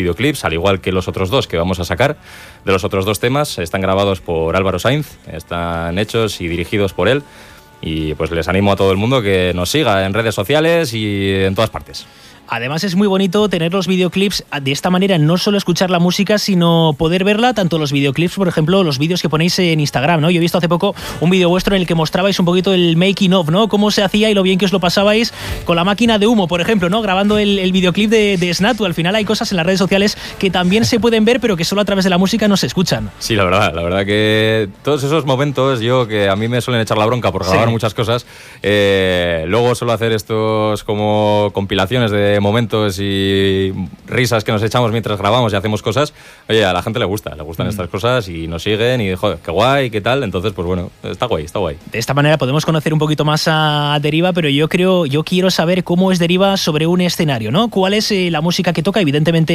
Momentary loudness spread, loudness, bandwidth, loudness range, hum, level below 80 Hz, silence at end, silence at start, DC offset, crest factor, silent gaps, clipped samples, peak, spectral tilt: 6 LU; -15 LUFS; 15.5 kHz; 4 LU; none; -42 dBFS; 0 s; 0 s; under 0.1%; 14 dB; none; under 0.1%; 0 dBFS; -5.5 dB/octave